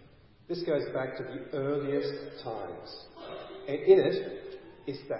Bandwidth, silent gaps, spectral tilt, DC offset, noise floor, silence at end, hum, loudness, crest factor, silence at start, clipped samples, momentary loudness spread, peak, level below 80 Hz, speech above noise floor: 5.8 kHz; none; -10 dB/octave; under 0.1%; -56 dBFS; 0 s; none; -31 LUFS; 22 dB; 0 s; under 0.1%; 21 LU; -10 dBFS; -66 dBFS; 26 dB